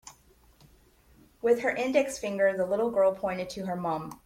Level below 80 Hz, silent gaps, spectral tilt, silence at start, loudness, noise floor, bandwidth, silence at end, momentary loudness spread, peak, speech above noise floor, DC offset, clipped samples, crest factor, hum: -62 dBFS; none; -5 dB/octave; 0.05 s; -28 LUFS; -60 dBFS; 16.5 kHz; 0.1 s; 7 LU; -10 dBFS; 33 dB; under 0.1%; under 0.1%; 18 dB; none